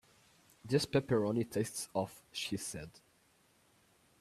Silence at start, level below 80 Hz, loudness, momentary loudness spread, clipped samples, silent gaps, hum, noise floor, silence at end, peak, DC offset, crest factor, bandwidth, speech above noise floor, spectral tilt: 0.65 s; -68 dBFS; -36 LUFS; 13 LU; under 0.1%; none; none; -70 dBFS; 1.3 s; -16 dBFS; under 0.1%; 22 dB; 14.5 kHz; 35 dB; -5 dB/octave